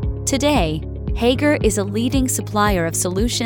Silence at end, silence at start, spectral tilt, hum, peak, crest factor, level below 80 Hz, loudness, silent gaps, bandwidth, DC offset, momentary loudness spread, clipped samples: 0 s; 0 s; -4.5 dB/octave; none; -2 dBFS; 16 dB; -28 dBFS; -19 LUFS; none; 19.5 kHz; under 0.1%; 4 LU; under 0.1%